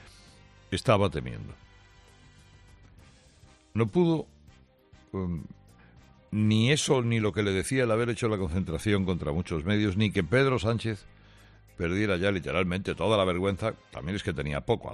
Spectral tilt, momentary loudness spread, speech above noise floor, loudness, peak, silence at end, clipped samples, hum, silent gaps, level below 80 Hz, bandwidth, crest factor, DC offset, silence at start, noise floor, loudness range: -6 dB/octave; 11 LU; 31 dB; -28 LUFS; -10 dBFS; 0 s; under 0.1%; none; none; -52 dBFS; 12.5 kHz; 18 dB; under 0.1%; 0 s; -58 dBFS; 6 LU